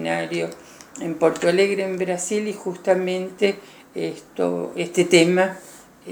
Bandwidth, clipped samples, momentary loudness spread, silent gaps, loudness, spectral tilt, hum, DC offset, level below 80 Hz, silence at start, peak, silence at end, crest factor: over 20 kHz; under 0.1%; 17 LU; none; -22 LUFS; -4.5 dB/octave; none; under 0.1%; -66 dBFS; 0 s; -2 dBFS; 0 s; 20 dB